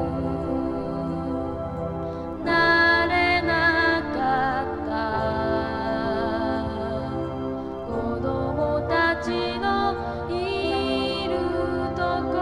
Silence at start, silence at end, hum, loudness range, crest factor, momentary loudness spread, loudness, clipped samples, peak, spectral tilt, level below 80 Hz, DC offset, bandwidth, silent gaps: 0 s; 0 s; none; 6 LU; 16 dB; 10 LU; -24 LUFS; under 0.1%; -10 dBFS; -6.5 dB/octave; -42 dBFS; under 0.1%; 11.5 kHz; none